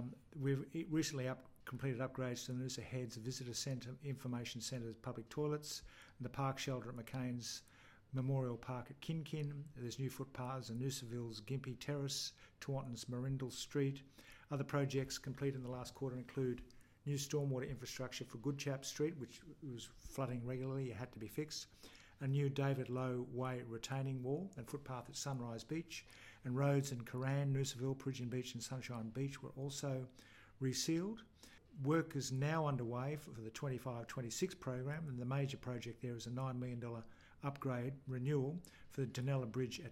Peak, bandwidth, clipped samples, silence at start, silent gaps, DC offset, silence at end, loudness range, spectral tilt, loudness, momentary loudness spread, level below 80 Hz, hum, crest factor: -24 dBFS; 16 kHz; under 0.1%; 0 s; none; under 0.1%; 0 s; 3 LU; -5.5 dB/octave; -43 LUFS; 11 LU; -70 dBFS; none; 18 dB